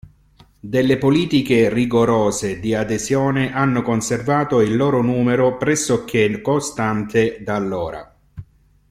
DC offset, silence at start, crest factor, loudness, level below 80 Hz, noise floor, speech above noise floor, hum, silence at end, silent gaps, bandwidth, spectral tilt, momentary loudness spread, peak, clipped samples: under 0.1%; 0.05 s; 14 dB; -18 LUFS; -46 dBFS; -52 dBFS; 34 dB; none; 0.5 s; none; 15.5 kHz; -5.5 dB/octave; 6 LU; -4 dBFS; under 0.1%